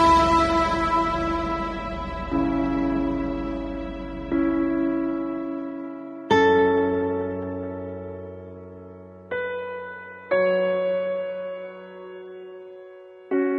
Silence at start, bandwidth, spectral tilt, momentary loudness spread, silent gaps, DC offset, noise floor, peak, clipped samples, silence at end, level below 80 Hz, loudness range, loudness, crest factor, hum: 0 s; 10.5 kHz; -6.5 dB/octave; 21 LU; none; under 0.1%; -44 dBFS; -6 dBFS; under 0.1%; 0 s; -40 dBFS; 5 LU; -24 LUFS; 18 dB; none